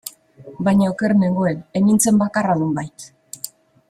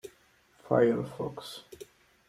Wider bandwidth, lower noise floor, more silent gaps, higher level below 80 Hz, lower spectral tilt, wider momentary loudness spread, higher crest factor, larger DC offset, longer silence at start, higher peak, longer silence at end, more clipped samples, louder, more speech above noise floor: about the same, 15.5 kHz vs 15 kHz; second, -42 dBFS vs -64 dBFS; neither; first, -56 dBFS vs -66 dBFS; about the same, -6 dB/octave vs -6.5 dB/octave; second, 18 LU vs 25 LU; second, 16 dB vs 22 dB; neither; about the same, 0.05 s vs 0.05 s; first, -2 dBFS vs -10 dBFS; about the same, 0.45 s vs 0.45 s; neither; first, -18 LUFS vs -29 LUFS; second, 25 dB vs 35 dB